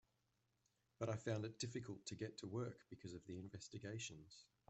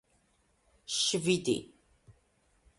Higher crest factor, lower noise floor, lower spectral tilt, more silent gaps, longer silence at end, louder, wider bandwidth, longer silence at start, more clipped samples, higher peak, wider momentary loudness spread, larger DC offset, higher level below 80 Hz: about the same, 20 dB vs 22 dB; first, -85 dBFS vs -71 dBFS; first, -5 dB/octave vs -3.5 dB/octave; neither; second, 0.25 s vs 0.7 s; second, -50 LUFS vs -30 LUFS; second, 8.2 kHz vs 11.5 kHz; about the same, 1 s vs 0.9 s; neither; second, -30 dBFS vs -14 dBFS; first, 10 LU vs 7 LU; neither; second, -80 dBFS vs -68 dBFS